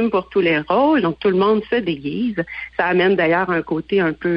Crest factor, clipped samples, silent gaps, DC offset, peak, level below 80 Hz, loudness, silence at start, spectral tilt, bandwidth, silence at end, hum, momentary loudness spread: 12 dB; under 0.1%; none; under 0.1%; -6 dBFS; -50 dBFS; -18 LUFS; 0 s; -9 dB/octave; 5.6 kHz; 0 s; none; 7 LU